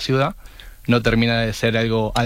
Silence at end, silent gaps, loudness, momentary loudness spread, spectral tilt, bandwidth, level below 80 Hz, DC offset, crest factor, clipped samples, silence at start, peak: 0 s; none; -19 LUFS; 9 LU; -6 dB/octave; 15.5 kHz; -36 dBFS; under 0.1%; 16 dB; under 0.1%; 0 s; -4 dBFS